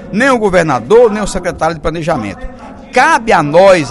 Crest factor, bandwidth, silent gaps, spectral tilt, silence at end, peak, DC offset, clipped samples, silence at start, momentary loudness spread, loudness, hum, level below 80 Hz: 10 dB; 12 kHz; none; -5 dB/octave; 0 s; 0 dBFS; under 0.1%; 0.5%; 0 s; 11 LU; -10 LUFS; none; -32 dBFS